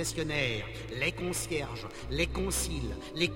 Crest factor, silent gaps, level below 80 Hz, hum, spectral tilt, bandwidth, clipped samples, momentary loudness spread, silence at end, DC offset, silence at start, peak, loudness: 20 dB; none; -42 dBFS; none; -3.5 dB/octave; 16.5 kHz; under 0.1%; 8 LU; 0 s; under 0.1%; 0 s; -14 dBFS; -33 LUFS